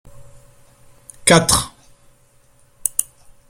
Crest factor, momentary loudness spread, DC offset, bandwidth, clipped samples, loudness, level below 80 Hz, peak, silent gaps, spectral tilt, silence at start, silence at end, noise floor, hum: 22 dB; 17 LU; under 0.1%; 16.5 kHz; under 0.1%; -16 LUFS; -44 dBFS; 0 dBFS; none; -3 dB/octave; 0.15 s; 0.5 s; -53 dBFS; none